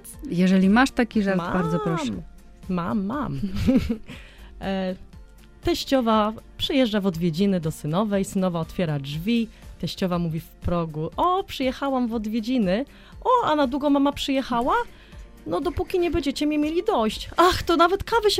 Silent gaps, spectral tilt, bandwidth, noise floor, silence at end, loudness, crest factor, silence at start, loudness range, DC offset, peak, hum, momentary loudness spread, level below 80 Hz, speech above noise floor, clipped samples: none; -6 dB/octave; 16 kHz; -46 dBFS; 0 s; -24 LUFS; 20 dB; 0.05 s; 4 LU; under 0.1%; -2 dBFS; none; 11 LU; -42 dBFS; 23 dB; under 0.1%